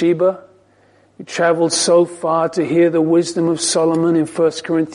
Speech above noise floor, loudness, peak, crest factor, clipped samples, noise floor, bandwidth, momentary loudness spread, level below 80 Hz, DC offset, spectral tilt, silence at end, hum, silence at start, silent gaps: 37 dB; -16 LUFS; -4 dBFS; 12 dB; under 0.1%; -53 dBFS; 11 kHz; 5 LU; -64 dBFS; under 0.1%; -4.5 dB/octave; 0 s; none; 0 s; none